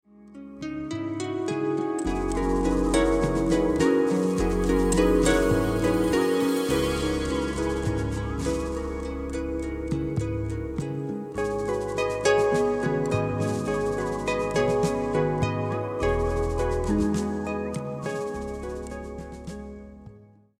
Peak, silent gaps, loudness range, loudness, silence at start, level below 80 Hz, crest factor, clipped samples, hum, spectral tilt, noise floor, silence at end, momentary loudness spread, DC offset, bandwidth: -8 dBFS; none; 7 LU; -26 LUFS; 0.2 s; -36 dBFS; 18 dB; under 0.1%; none; -6 dB/octave; -52 dBFS; 0.35 s; 11 LU; under 0.1%; 16.5 kHz